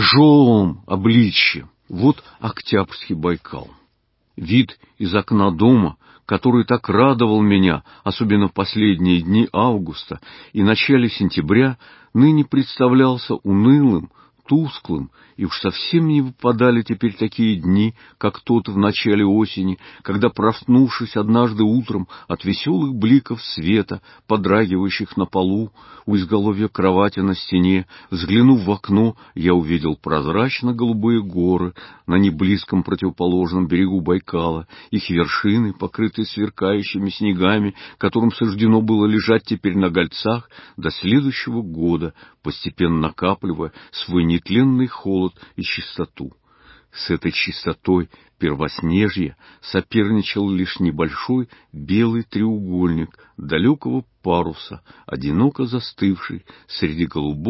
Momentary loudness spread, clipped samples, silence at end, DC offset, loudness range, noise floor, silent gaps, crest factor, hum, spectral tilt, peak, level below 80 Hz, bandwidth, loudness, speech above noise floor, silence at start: 13 LU; under 0.1%; 0 s; under 0.1%; 5 LU; -65 dBFS; none; 16 dB; none; -11 dB/octave; -2 dBFS; -42 dBFS; 5.8 kHz; -18 LUFS; 47 dB; 0 s